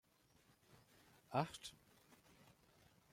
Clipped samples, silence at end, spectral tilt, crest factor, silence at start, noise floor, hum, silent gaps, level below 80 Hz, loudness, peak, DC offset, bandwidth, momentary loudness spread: under 0.1%; 1.4 s; -5 dB/octave; 28 dB; 1.3 s; -74 dBFS; none; none; -82 dBFS; -46 LUFS; -24 dBFS; under 0.1%; 16.5 kHz; 26 LU